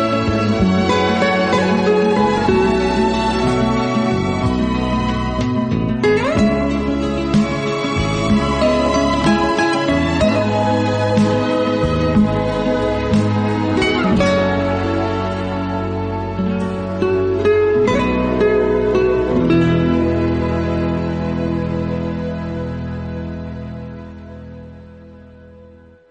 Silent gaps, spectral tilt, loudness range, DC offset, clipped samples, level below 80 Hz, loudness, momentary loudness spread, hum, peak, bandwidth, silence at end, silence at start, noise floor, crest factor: none; -6.5 dB/octave; 7 LU; under 0.1%; under 0.1%; -32 dBFS; -17 LUFS; 8 LU; none; -2 dBFS; 9.4 kHz; 0.45 s; 0 s; -43 dBFS; 14 dB